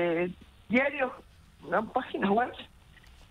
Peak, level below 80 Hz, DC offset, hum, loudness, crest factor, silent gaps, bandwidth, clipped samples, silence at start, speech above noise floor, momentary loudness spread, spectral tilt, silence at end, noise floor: -12 dBFS; -58 dBFS; under 0.1%; none; -30 LUFS; 20 dB; none; 12 kHz; under 0.1%; 0 s; 25 dB; 23 LU; -7 dB/octave; 0.65 s; -55 dBFS